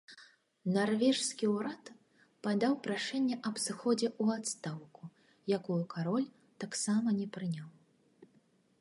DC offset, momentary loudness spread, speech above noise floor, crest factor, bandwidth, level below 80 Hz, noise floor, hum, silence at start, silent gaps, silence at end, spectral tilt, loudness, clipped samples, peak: under 0.1%; 15 LU; 36 dB; 18 dB; 11.5 kHz; -84 dBFS; -70 dBFS; none; 0.1 s; none; 0.55 s; -4.5 dB/octave; -34 LUFS; under 0.1%; -18 dBFS